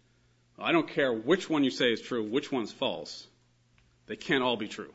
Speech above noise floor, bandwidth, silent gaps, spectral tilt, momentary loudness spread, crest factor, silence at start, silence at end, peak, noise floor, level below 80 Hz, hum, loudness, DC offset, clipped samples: 37 dB; 8 kHz; none; -4.5 dB/octave; 13 LU; 20 dB; 0.6 s; 0.05 s; -10 dBFS; -66 dBFS; -72 dBFS; none; -29 LUFS; under 0.1%; under 0.1%